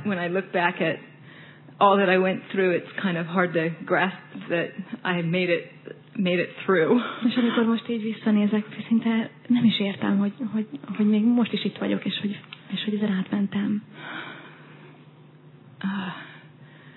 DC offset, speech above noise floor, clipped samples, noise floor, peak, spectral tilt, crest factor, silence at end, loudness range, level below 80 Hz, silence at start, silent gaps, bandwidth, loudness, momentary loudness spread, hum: under 0.1%; 26 dB; under 0.1%; -50 dBFS; -4 dBFS; -9.5 dB/octave; 20 dB; 0.05 s; 7 LU; -82 dBFS; 0 s; none; 4.3 kHz; -24 LUFS; 14 LU; none